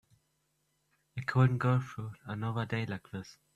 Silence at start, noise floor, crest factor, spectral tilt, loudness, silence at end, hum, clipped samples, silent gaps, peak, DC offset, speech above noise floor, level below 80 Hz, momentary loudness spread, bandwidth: 1.15 s; -78 dBFS; 22 dB; -8 dB/octave; -33 LUFS; 0.25 s; none; under 0.1%; none; -12 dBFS; under 0.1%; 45 dB; -68 dBFS; 17 LU; 7.6 kHz